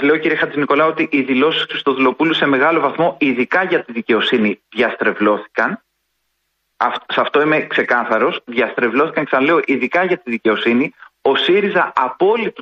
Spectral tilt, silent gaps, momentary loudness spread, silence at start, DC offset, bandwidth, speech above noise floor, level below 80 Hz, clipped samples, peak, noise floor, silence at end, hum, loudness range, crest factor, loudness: -6.5 dB/octave; none; 5 LU; 0 s; under 0.1%; 7.4 kHz; 54 dB; -64 dBFS; under 0.1%; -2 dBFS; -70 dBFS; 0 s; none; 3 LU; 14 dB; -16 LUFS